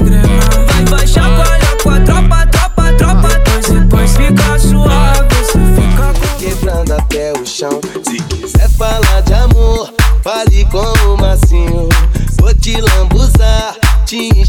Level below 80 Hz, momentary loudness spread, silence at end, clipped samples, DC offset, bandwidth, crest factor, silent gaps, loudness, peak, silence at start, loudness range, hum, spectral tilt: -10 dBFS; 6 LU; 0 s; under 0.1%; under 0.1%; 16.5 kHz; 8 dB; none; -11 LUFS; 0 dBFS; 0 s; 3 LU; none; -5 dB/octave